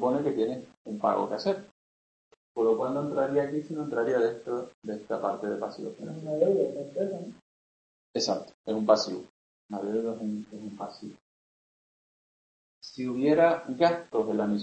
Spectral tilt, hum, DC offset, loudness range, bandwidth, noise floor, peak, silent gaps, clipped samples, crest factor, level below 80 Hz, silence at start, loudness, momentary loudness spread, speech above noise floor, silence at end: -5.5 dB/octave; none; under 0.1%; 8 LU; 8.6 kHz; under -90 dBFS; -8 dBFS; 0.77-0.85 s, 1.71-2.31 s, 2.37-2.55 s, 4.74-4.82 s, 7.42-8.14 s, 8.54-8.64 s, 9.30-9.69 s, 11.21-12.81 s; under 0.1%; 22 dB; -72 dBFS; 0 s; -29 LUFS; 15 LU; over 61 dB; 0 s